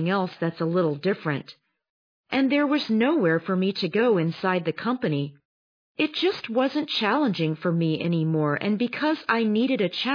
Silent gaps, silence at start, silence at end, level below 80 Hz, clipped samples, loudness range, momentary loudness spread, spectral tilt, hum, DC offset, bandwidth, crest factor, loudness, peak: 1.90-2.24 s, 5.45-5.95 s; 0 s; 0 s; -74 dBFS; under 0.1%; 2 LU; 6 LU; -7.5 dB/octave; none; under 0.1%; 5.2 kHz; 16 dB; -24 LUFS; -8 dBFS